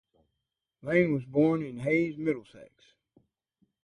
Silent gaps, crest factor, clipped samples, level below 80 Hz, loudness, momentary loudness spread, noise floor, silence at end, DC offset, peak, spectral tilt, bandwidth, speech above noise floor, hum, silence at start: none; 20 dB; under 0.1%; -68 dBFS; -28 LUFS; 8 LU; -85 dBFS; 1.2 s; under 0.1%; -10 dBFS; -8.5 dB/octave; 10 kHz; 57 dB; none; 0.85 s